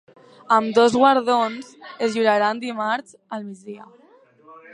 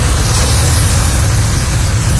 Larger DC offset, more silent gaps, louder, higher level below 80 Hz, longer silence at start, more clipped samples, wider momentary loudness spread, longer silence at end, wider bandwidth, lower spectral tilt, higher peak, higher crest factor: neither; neither; second, -19 LUFS vs -12 LUFS; second, -68 dBFS vs -16 dBFS; first, 0.5 s vs 0 s; neither; first, 21 LU vs 3 LU; first, 0.2 s vs 0 s; about the same, 10.5 kHz vs 11 kHz; about the same, -4.5 dB/octave vs -4 dB/octave; about the same, -2 dBFS vs 0 dBFS; first, 20 dB vs 10 dB